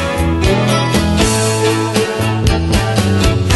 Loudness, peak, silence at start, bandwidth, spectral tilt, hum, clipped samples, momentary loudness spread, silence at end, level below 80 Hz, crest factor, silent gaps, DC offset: -14 LUFS; 0 dBFS; 0 s; 12.5 kHz; -5 dB/octave; none; under 0.1%; 2 LU; 0 s; -22 dBFS; 12 dB; none; under 0.1%